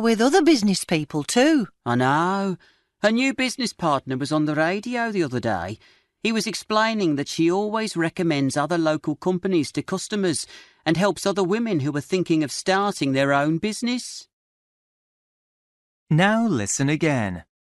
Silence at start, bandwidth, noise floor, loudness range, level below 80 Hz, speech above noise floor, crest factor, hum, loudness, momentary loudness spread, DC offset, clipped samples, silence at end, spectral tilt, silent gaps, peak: 0 s; 12 kHz; under -90 dBFS; 3 LU; -60 dBFS; over 68 dB; 18 dB; none; -22 LUFS; 8 LU; under 0.1%; under 0.1%; 0.2 s; -5 dB/octave; 14.33-16.06 s; -4 dBFS